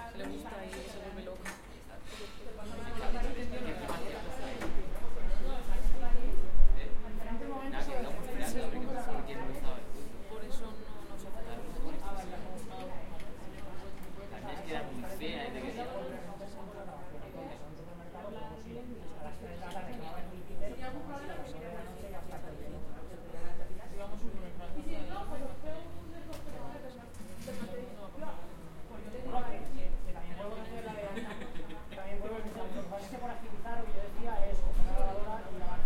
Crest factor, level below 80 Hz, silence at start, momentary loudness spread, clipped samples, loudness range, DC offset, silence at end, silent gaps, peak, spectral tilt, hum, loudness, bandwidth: 22 dB; -38 dBFS; 0 s; 9 LU; under 0.1%; 7 LU; under 0.1%; 0 s; none; -8 dBFS; -5.5 dB/octave; none; -43 LUFS; 11 kHz